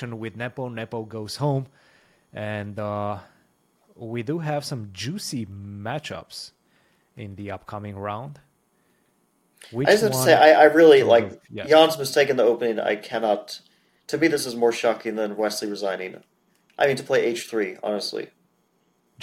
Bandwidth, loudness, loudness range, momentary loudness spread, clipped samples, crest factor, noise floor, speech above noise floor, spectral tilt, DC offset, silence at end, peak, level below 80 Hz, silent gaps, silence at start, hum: 16.5 kHz; -22 LUFS; 17 LU; 21 LU; under 0.1%; 22 dB; -67 dBFS; 45 dB; -4.5 dB/octave; under 0.1%; 0 s; -2 dBFS; -66 dBFS; none; 0 s; none